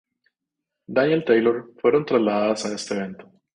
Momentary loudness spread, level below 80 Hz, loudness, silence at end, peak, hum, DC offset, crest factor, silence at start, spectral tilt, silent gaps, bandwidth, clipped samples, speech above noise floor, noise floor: 9 LU; -66 dBFS; -22 LUFS; 0.35 s; -4 dBFS; none; under 0.1%; 18 dB; 0.9 s; -5.5 dB/octave; none; 10.5 kHz; under 0.1%; 62 dB; -83 dBFS